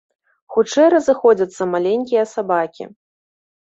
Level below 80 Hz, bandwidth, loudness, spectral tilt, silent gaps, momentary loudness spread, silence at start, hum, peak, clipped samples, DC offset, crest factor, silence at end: -64 dBFS; 8 kHz; -17 LUFS; -5 dB/octave; none; 11 LU; 0.5 s; none; -2 dBFS; under 0.1%; under 0.1%; 16 dB; 0.8 s